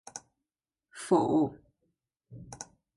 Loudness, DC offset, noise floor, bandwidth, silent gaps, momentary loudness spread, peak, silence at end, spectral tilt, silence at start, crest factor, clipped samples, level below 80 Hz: -28 LUFS; under 0.1%; under -90 dBFS; 11.5 kHz; none; 24 LU; -14 dBFS; 0.35 s; -6 dB/octave; 0.15 s; 20 dB; under 0.1%; -66 dBFS